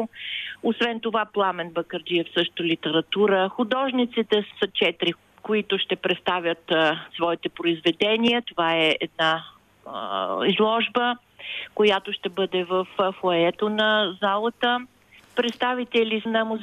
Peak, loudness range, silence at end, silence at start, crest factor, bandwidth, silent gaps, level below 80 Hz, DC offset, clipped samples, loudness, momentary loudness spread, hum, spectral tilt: -8 dBFS; 2 LU; 0 s; 0 s; 16 dB; 12 kHz; none; -68 dBFS; under 0.1%; under 0.1%; -23 LUFS; 8 LU; none; -5.5 dB/octave